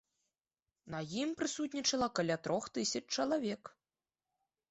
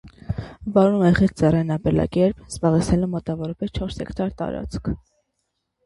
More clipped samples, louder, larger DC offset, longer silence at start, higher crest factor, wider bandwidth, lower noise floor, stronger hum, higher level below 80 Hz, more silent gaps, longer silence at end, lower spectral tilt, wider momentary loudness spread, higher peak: neither; second, -36 LUFS vs -22 LUFS; neither; first, 0.85 s vs 0.05 s; about the same, 18 dB vs 18 dB; second, 8.2 kHz vs 11.5 kHz; first, under -90 dBFS vs -76 dBFS; neither; second, -72 dBFS vs -38 dBFS; neither; about the same, 1 s vs 0.9 s; second, -3.5 dB/octave vs -7.5 dB/octave; about the same, 11 LU vs 13 LU; second, -20 dBFS vs -2 dBFS